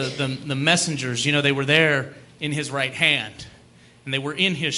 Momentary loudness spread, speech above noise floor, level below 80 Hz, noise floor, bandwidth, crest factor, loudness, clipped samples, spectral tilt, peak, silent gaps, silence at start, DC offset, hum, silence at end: 14 LU; 29 dB; -60 dBFS; -51 dBFS; 12 kHz; 20 dB; -21 LUFS; under 0.1%; -3.5 dB/octave; -2 dBFS; none; 0 s; under 0.1%; none; 0 s